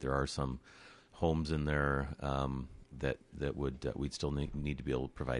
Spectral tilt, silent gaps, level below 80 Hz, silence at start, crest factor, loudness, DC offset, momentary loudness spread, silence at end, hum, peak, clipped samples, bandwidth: -6.5 dB/octave; none; -46 dBFS; 0 s; 18 dB; -37 LUFS; under 0.1%; 11 LU; 0 s; none; -18 dBFS; under 0.1%; 11.5 kHz